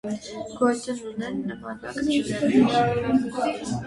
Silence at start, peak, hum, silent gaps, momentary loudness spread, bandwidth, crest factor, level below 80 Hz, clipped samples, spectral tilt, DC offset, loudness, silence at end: 0.05 s; -8 dBFS; none; none; 13 LU; 11.5 kHz; 16 dB; -54 dBFS; under 0.1%; -5.5 dB/octave; under 0.1%; -24 LUFS; 0 s